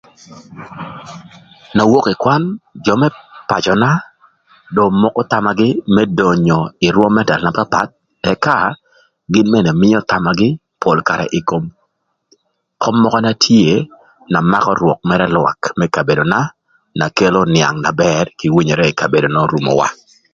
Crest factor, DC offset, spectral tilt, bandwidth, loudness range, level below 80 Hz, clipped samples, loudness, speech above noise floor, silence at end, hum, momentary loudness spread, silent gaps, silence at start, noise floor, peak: 14 dB; under 0.1%; -6 dB/octave; 7.6 kHz; 2 LU; -46 dBFS; under 0.1%; -14 LUFS; 52 dB; 0.4 s; none; 9 LU; none; 0.3 s; -66 dBFS; 0 dBFS